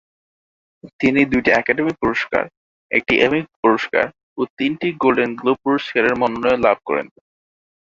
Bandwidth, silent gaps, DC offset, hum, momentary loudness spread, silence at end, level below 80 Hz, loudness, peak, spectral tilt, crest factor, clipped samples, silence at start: 7.6 kHz; 0.93-0.99 s, 2.57-2.89 s, 3.56-3.63 s, 4.23-4.36 s, 4.50-4.57 s; under 0.1%; none; 8 LU; 0.75 s; -50 dBFS; -18 LUFS; -2 dBFS; -6 dB/octave; 18 dB; under 0.1%; 0.85 s